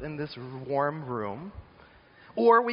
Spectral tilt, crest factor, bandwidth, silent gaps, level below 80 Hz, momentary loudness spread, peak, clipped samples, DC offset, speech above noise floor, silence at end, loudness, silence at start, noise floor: -5 dB/octave; 20 dB; 5.4 kHz; none; -58 dBFS; 20 LU; -8 dBFS; under 0.1%; under 0.1%; 28 dB; 0 s; -29 LUFS; 0 s; -55 dBFS